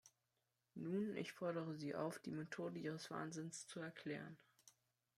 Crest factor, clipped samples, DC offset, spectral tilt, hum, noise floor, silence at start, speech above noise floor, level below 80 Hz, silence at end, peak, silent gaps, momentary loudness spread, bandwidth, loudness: 18 dB; under 0.1%; under 0.1%; -5.5 dB/octave; none; -89 dBFS; 0.05 s; 41 dB; -88 dBFS; 0.5 s; -30 dBFS; none; 7 LU; 15 kHz; -48 LUFS